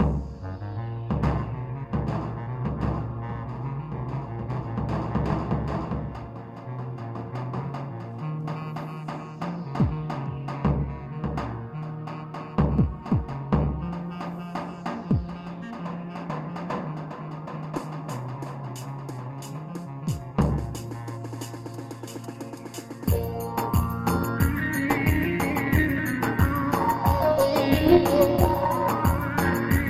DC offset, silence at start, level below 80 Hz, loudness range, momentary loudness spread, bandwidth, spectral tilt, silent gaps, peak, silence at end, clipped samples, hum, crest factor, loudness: under 0.1%; 0 s; -38 dBFS; 12 LU; 13 LU; 16 kHz; -7 dB/octave; none; -2 dBFS; 0 s; under 0.1%; none; 24 dB; -28 LUFS